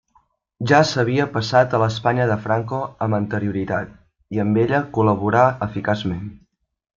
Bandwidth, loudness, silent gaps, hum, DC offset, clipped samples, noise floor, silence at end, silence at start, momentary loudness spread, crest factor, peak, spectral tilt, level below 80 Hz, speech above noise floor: 7.6 kHz; -20 LUFS; none; none; under 0.1%; under 0.1%; -61 dBFS; 0.6 s; 0.6 s; 11 LU; 18 dB; -2 dBFS; -6.5 dB/octave; -52 dBFS; 42 dB